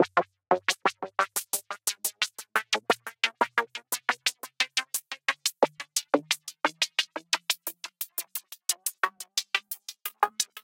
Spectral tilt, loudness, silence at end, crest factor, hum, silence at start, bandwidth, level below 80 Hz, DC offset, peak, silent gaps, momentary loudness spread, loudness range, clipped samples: 0 dB/octave; -29 LUFS; 0.05 s; 26 dB; none; 0 s; 17 kHz; -86 dBFS; under 0.1%; -4 dBFS; none; 6 LU; 2 LU; under 0.1%